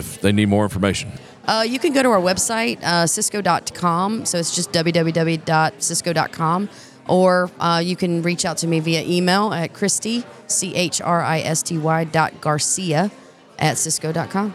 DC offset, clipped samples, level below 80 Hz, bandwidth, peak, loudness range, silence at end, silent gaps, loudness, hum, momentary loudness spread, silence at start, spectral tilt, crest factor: under 0.1%; under 0.1%; -56 dBFS; 15.5 kHz; -2 dBFS; 1 LU; 0 s; none; -19 LUFS; none; 5 LU; 0 s; -4 dB/octave; 18 dB